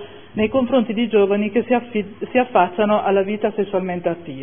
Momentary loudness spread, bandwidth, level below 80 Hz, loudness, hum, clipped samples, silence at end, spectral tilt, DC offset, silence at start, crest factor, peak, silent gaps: 7 LU; 3.6 kHz; -54 dBFS; -19 LUFS; none; under 0.1%; 0 s; -10.5 dB/octave; 0.5%; 0 s; 16 dB; -2 dBFS; none